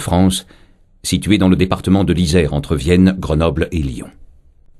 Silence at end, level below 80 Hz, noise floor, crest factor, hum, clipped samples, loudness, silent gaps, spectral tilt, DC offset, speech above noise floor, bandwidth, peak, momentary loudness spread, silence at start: 0.55 s; -30 dBFS; -45 dBFS; 16 dB; none; under 0.1%; -15 LUFS; none; -6 dB/octave; under 0.1%; 31 dB; 13 kHz; 0 dBFS; 10 LU; 0 s